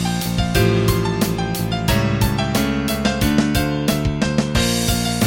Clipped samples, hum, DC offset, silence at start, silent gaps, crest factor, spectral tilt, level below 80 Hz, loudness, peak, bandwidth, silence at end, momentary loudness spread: under 0.1%; none; under 0.1%; 0 s; none; 16 dB; -5 dB/octave; -30 dBFS; -19 LUFS; -2 dBFS; 17 kHz; 0 s; 4 LU